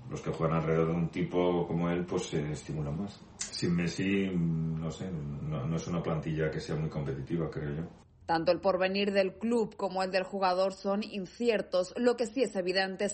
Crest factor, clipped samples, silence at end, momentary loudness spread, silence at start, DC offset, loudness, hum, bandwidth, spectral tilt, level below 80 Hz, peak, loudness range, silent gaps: 16 dB; under 0.1%; 0 s; 9 LU; 0 s; under 0.1%; -32 LUFS; none; 8.4 kHz; -6 dB/octave; -54 dBFS; -14 dBFS; 4 LU; none